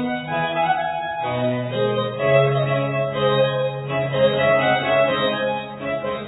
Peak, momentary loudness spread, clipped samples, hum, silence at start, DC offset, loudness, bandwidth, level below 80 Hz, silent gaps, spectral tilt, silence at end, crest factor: -4 dBFS; 7 LU; under 0.1%; none; 0 s; under 0.1%; -20 LUFS; 4.1 kHz; -56 dBFS; none; -9.5 dB/octave; 0 s; 16 dB